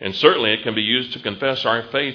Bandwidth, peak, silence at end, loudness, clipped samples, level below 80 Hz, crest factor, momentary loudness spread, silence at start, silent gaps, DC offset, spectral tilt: 5.4 kHz; 0 dBFS; 0 s; -19 LUFS; under 0.1%; -60 dBFS; 18 dB; 7 LU; 0 s; none; under 0.1%; -5.5 dB/octave